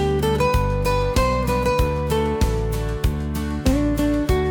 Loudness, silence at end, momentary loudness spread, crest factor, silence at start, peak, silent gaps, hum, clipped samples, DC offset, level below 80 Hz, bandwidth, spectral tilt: -21 LUFS; 0 s; 4 LU; 12 dB; 0 s; -8 dBFS; none; none; under 0.1%; under 0.1%; -26 dBFS; 19 kHz; -6.5 dB/octave